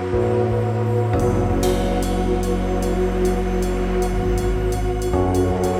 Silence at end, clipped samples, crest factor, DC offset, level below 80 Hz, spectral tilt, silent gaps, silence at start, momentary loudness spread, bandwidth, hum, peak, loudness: 0 s; under 0.1%; 12 dB; under 0.1%; -26 dBFS; -7 dB/octave; none; 0 s; 3 LU; 16 kHz; none; -6 dBFS; -21 LUFS